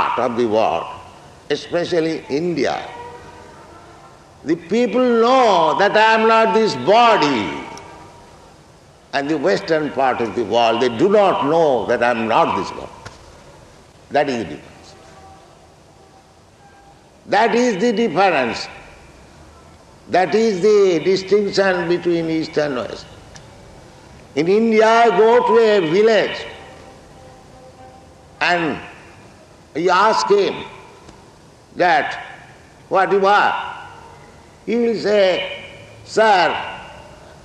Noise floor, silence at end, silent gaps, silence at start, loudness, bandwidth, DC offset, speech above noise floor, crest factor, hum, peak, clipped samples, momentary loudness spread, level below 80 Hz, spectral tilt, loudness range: -48 dBFS; 0.3 s; none; 0 s; -16 LUFS; 10.5 kHz; under 0.1%; 32 dB; 16 dB; none; -2 dBFS; under 0.1%; 19 LU; -54 dBFS; -5 dB/octave; 8 LU